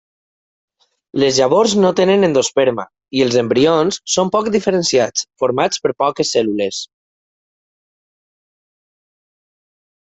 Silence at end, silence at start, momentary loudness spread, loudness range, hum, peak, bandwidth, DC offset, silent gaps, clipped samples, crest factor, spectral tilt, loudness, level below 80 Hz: 3.2 s; 1.15 s; 8 LU; 9 LU; none; -2 dBFS; 8.4 kHz; under 0.1%; none; under 0.1%; 16 dB; -4 dB/octave; -15 LUFS; -58 dBFS